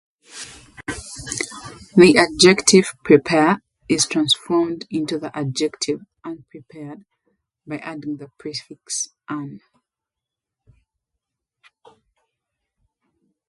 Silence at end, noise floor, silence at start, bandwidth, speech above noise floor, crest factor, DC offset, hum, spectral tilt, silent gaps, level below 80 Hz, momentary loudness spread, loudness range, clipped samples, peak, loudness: 3.9 s; -86 dBFS; 0.35 s; 11.5 kHz; 67 dB; 22 dB; under 0.1%; none; -3.5 dB/octave; none; -54 dBFS; 23 LU; 17 LU; under 0.1%; 0 dBFS; -18 LUFS